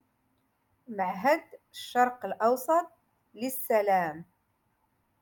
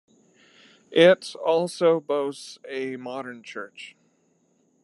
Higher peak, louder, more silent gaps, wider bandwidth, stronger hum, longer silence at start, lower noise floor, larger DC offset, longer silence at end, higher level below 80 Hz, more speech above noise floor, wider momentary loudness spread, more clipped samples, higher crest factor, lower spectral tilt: second, -12 dBFS vs -4 dBFS; second, -28 LUFS vs -23 LUFS; neither; first, 17.5 kHz vs 11.5 kHz; neither; about the same, 0.9 s vs 0.9 s; first, -74 dBFS vs -66 dBFS; neither; about the same, 1 s vs 0.95 s; about the same, -78 dBFS vs -82 dBFS; about the same, 46 dB vs 43 dB; second, 17 LU vs 21 LU; neither; about the same, 18 dB vs 22 dB; about the same, -4.5 dB/octave vs -5 dB/octave